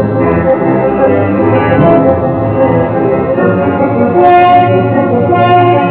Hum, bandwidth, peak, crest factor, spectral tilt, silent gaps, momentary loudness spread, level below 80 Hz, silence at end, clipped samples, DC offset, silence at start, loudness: none; 4 kHz; 0 dBFS; 8 dB; -11.5 dB/octave; none; 5 LU; -32 dBFS; 0 s; 0.6%; 0.2%; 0 s; -9 LUFS